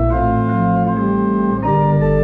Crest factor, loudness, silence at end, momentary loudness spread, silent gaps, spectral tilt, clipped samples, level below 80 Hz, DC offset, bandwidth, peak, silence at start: 12 dB; -16 LUFS; 0 s; 2 LU; none; -11.5 dB/octave; under 0.1%; -28 dBFS; under 0.1%; 4.2 kHz; -4 dBFS; 0 s